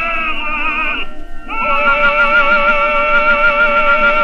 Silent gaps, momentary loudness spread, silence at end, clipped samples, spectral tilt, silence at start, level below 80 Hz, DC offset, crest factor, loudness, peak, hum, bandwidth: none; 8 LU; 0 s; under 0.1%; -4.5 dB/octave; 0 s; -26 dBFS; under 0.1%; 12 dB; -12 LUFS; 0 dBFS; none; 6.4 kHz